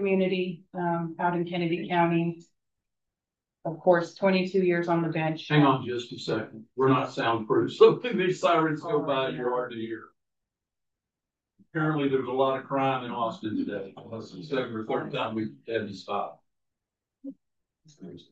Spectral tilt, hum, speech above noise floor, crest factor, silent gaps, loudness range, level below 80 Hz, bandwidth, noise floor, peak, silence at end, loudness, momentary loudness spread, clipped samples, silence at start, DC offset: -7 dB/octave; none; 63 dB; 22 dB; none; 9 LU; -76 dBFS; 8 kHz; -89 dBFS; -6 dBFS; 0.1 s; -27 LUFS; 14 LU; under 0.1%; 0 s; under 0.1%